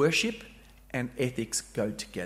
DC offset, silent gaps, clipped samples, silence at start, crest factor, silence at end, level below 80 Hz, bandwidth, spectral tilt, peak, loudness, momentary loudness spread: under 0.1%; none; under 0.1%; 0 s; 18 dB; 0 s; -56 dBFS; 16 kHz; -4 dB/octave; -12 dBFS; -31 LUFS; 12 LU